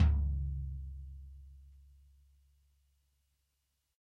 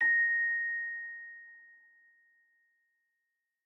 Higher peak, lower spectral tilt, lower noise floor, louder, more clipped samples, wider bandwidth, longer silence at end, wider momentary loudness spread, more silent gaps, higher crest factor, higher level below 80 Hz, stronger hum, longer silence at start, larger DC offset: first, -16 dBFS vs -22 dBFS; first, -9 dB/octave vs -2.5 dB/octave; about the same, -82 dBFS vs -85 dBFS; second, -38 LUFS vs -30 LUFS; neither; first, 3.9 kHz vs 3.4 kHz; first, 2.3 s vs 2.05 s; about the same, 24 LU vs 23 LU; neither; first, 20 dB vs 14 dB; first, -40 dBFS vs under -90 dBFS; neither; about the same, 0 s vs 0 s; neither